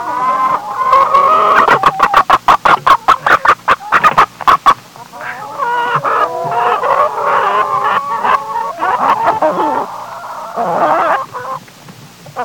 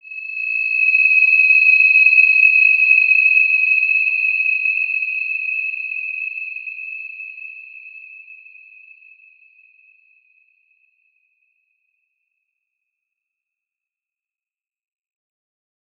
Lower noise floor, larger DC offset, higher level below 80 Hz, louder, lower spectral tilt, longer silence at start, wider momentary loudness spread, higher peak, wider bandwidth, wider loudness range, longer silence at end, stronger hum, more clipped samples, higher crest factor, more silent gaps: second, -36 dBFS vs under -90 dBFS; neither; first, -46 dBFS vs under -90 dBFS; about the same, -11 LUFS vs -12 LUFS; first, -3.5 dB/octave vs 4 dB/octave; about the same, 0 s vs 0.05 s; second, 15 LU vs 19 LU; about the same, 0 dBFS vs -2 dBFS; first, 20 kHz vs 5.6 kHz; second, 6 LU vs 21 LU; second, 0 s vs 7.65 s; neither; first, 0.1% vs under 0.1%; second, 12 dB vs 18 dB; neither